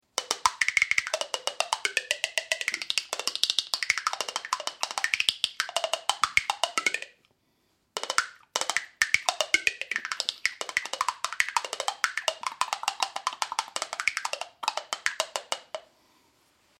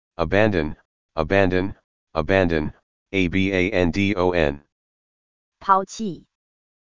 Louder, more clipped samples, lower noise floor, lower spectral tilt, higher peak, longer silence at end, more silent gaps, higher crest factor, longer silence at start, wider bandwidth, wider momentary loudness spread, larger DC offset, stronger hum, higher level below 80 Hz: second, -28 LUFS vs -22 LUFS; neither; second, -71 dBFS vs under -90 dBFS; second, 2 dB/octave vs -6.5 dB/octave; about the same, -2 dBFS vs -2 dBFS; first, 1 s vs 0.55 s; second, none vs 0.85-1.09 s, 1.84-2.07 s, 2.83-3.06 s, 4.72-5.52 s; first, 28 dB vs 22 dB; about the same, 0.15 s vs 0.1 s; first, 16 kHz vs 7.6 kHz; second, 8 LU vs 12 LU; second, under 0.1% vs 1%; neither; second, -70 dBFS vs -40 dBFS